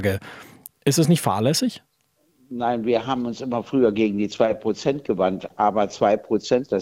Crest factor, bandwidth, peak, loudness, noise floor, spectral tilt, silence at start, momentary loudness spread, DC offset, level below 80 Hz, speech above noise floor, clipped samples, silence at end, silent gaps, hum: 18 dB; 16.5 kHz; -4 dBFS; -22 LUFS; -66 dBFS; -5.5 dB/octave; 0 s; 9 LU; under 0.1%; -58 dBFS; 44 dB; under 0.1%; 0 s; none; none